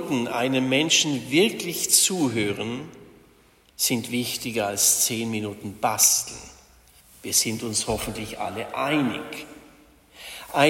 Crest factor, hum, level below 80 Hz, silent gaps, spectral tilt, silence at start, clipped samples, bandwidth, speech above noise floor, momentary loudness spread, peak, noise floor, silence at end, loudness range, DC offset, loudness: 20 dB; none; -54 dBFS; none; -2 dB/octave; 0 s; under 0.1%; 16.5 kHz; 33 dB; 18 LU; -4 dBFS; -57 dBFS; 0 s; 5 LU; under 0.1%; -22 LUFS